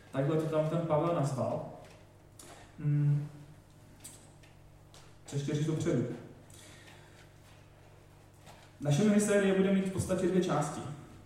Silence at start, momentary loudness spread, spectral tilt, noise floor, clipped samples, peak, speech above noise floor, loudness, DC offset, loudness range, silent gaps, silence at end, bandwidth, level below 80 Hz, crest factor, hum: 0.15 s; 25 LU; -6.5 dB/octave; -57 dBFS; under 0.1%; -16 dBFS; 27 dB; -31 LUFS; under 0.1%; 7 LU; none; 0.1 s; 14.5 kHz; -64 dBFS; 18 dB; none